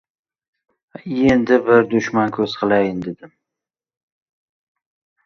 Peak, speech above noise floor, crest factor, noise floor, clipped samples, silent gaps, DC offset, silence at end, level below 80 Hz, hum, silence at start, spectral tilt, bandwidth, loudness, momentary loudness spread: 0 dBFS; 70 dB; 20 dB; -87 dBFS; under 0.1%; none; under 0.1%; 2 s; -52 dBFS; none; 1.05 s; -6.5 dB/octave; 7.4 kHz; -17 LUFS; 16 LU